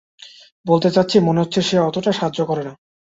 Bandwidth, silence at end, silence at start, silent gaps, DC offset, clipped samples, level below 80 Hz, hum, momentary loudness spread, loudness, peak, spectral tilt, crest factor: 8 kHz; 0.4 s; 0.2 s; 0.52-0.64 s; under 0.1%; under 0.1%; -58 dBFS; none; 9 LU; -18 LUFS; -2 dBFS; -6 dB/octave; 18 dB